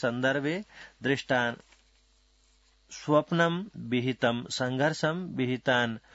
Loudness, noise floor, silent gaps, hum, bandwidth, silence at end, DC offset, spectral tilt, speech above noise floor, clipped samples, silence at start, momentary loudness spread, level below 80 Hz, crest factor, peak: -29 LUFS; -65 dBFS; none; none; 8 kHz; 0.15 s; under 0.1%; -5.5 dB/octave; 36 dB; under 0.1%; 0 s; 9 LU; -66 dBFS; 20 dB; -10 dBFS